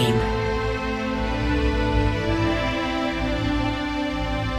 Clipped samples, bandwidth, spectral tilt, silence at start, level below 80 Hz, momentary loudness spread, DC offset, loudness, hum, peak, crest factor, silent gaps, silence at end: under 0.1%; 13.5 kHz; -6.5 dB/octave; 0 s; -30 dBFS; 3 LU; under 0.1%; -24 LUFS; none; -10 dBFS; 14 dB; none; 0 s